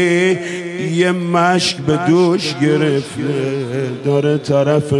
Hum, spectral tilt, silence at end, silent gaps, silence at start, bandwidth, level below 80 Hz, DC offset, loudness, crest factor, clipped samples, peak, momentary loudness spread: none; -5.5 dB/octave; 0 s; none; 0 s; 12 kHz; -58 dBFS; under 0.1%; -16 LUFS; 14 dB; under 0.1%; 0 dBFS; 7 LU